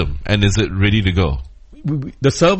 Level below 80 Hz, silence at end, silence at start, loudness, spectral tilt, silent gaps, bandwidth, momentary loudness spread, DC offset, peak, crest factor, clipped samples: -28 dBFS; 0 s; 0 s; -17 LUFS; -5.5 dB/octave; none; 8.6 kHz; 9 LU; under 0.1%; 0 dBFS; 16 dB; under 0.1%